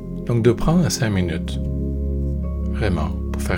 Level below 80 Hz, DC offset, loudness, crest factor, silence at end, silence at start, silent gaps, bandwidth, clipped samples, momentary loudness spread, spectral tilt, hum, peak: -26 dBFS; under 0.1%; -22 LUFS; 18 dB; 0 s; 0 s; none; 17 kHz; under 0.1%; 7 LU; -6 dB/octave; none; -2 dBFS